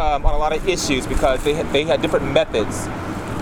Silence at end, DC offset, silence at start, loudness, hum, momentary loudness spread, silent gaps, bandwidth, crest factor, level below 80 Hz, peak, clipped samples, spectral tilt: 0 s; under 0.1%; 0 s; -20 LUFS; none; 8 LU; none; 16.5 kHz; 18 dB; -26 dBFS; -2 dBFS; under 0.1%; -4.5 dB/octave